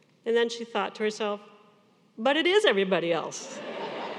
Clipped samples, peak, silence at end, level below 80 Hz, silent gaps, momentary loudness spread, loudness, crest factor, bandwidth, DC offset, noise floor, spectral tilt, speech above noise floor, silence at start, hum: under 0.1%; -8 dBFS; 0 s; -88 dBFS; none; 14 LU; -27 LUFS; 20 dB; 11.5 kHz; under 0.1%; -61 dBFS; -3.5 dB/octave; 35 dB; 0.25 s; none